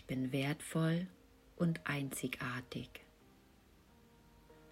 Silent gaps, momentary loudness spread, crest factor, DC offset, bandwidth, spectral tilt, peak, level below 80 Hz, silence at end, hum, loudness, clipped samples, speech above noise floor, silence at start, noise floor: none; 12 LU; 18 dB; under 0.1%; 16 kHz; -5.5 dB/octave; -24 dBFS; -68 dBFS; 0 s; none; -39 LUFS; under 0.1%; 27 dB; 0.05 s; -65 dBFS